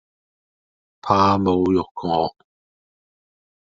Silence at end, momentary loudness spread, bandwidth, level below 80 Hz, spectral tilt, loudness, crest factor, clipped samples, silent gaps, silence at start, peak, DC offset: 1.3 s; 9 LU; 7.6 kHz; -58 dBFS; -6 dB/octave; -20 LUFS; 22 dB; under 0.1%; 1.91-1.95 s; 1.05 s; -2 dBFS; under 0.1%